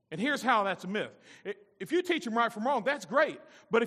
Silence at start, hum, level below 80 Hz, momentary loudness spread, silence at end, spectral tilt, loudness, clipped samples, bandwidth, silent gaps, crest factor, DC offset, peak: 0.1 s; none; -84 dBFS; 15 LU; 0 s; -4.5 dB/octave; -30 LUFS; under 0.1%; 14.5 kHz; none; 18 dB; under 0.1%; -12 dBFS